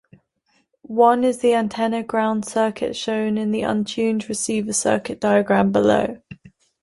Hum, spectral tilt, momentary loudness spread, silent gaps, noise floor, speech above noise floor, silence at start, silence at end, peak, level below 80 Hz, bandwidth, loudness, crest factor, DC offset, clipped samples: none; -4.5 dB/octave; 7 LU; none; -66 dBFS; 46 dB; 0.9 s; 0.35 s; -2 dBFS; -56 dBFS; 11.5 kHz; -20 LUFS; 18 dB; under 0.1%; under 0.1%